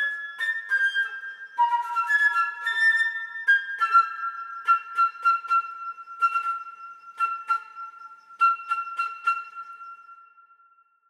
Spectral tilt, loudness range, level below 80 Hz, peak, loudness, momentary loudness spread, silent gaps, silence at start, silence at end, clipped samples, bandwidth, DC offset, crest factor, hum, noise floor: 3 dB/octave; 6 LU; under -90 dBFS; -10 dBFS; -24 LUFS; 19 LU; none; 0 s; 0.9 s; under 0.1%; 15 kHz; under 0.1%; 18 dB; none; -60 dBFS